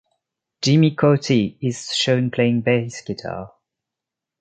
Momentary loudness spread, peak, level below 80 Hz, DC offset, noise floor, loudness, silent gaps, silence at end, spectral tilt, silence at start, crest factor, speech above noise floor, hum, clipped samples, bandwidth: 13 LU; -2 dBFS; -56 dBFS; under 0.1%; -85 dBFS; -19 LUFS; none; 0.95 s; -5.5 dB/octave; 0.6 s; 18 dB; 67 dB; none; under 0.1%; 9.2 kHz